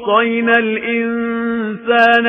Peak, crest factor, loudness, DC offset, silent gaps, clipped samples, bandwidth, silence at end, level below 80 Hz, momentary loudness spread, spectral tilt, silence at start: 0 dBFS; 14 dB; -15 LUFS; under 0.1%; none; under 0.1%; 6.2 kHz; 0 s; -56 dBFS; 7 LU; -6 dB/octave; 0 s